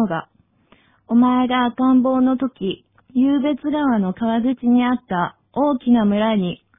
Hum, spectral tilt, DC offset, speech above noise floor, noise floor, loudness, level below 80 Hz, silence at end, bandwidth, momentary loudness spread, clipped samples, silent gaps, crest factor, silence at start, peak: none; -11 dB/octave; under 0.1%; 38 dB; -56 dBFS; -19 LUFS; -54 dBFS; 0.25 s; 3.8 kHz; 8 LU; under 0.1%; none; 14 dB; 0 s; -6 dBFS